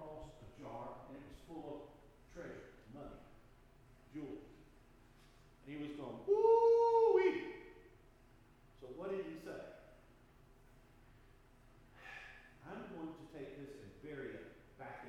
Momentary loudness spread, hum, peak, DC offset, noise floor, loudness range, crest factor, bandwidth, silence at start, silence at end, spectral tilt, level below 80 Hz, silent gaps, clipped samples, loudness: 27 LU; none; -20 dBFS; under 0.1%; -65 dBFS; 21 LU; 20 dB; 7.8 kHz; 0 s; 0 s; -7 dB/octave; -66 dBFS; none; under 0.1%; -37 LUFS